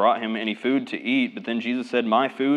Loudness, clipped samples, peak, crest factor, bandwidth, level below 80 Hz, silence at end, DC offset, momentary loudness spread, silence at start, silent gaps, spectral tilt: -24 LUFS; under 0.1%; -6 dBFS; 18 dB; 9.2 kHz; -88 dBFS; 0 s; under 0.1%; 5 LU; 0 s; none; -6 dB/octave